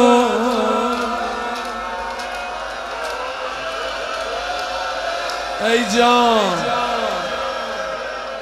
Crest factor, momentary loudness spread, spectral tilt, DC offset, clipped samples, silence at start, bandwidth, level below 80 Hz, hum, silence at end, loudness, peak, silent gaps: 20 dB; 12 LU; -3 dB/octave; under 0.1%; under 0.1%; 0 s; 15 kHz; -46 dBFS; none; 0 s; -20 LUFS; 0 dBFS; none